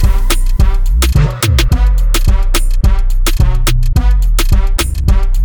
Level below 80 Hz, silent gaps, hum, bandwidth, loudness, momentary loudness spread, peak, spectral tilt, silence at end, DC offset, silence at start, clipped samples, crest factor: -10 dBFS; none; none; 19.5 kHz; -14 LUFS; 3 LU; 0 dBFS; -4.5 dB/octave; 0 s; 0.9%; 0 s; under 0.1%; 8 dB